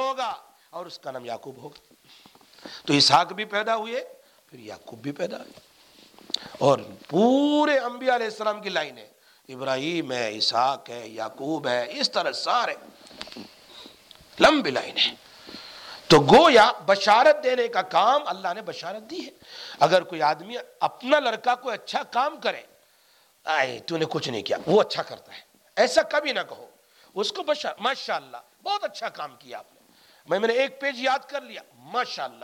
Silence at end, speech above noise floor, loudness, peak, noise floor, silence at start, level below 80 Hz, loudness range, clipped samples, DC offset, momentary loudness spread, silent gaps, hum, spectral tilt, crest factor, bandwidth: 0.1 s; 36 dB; -23 LUFS; -6 dBFS; -60 dBFS; 0 s; -62 dBFS; 10 LU; under 0.1%; under 0.1%; 21 LU; none; none; -4 dB/octave; 18 dB; 17 kHz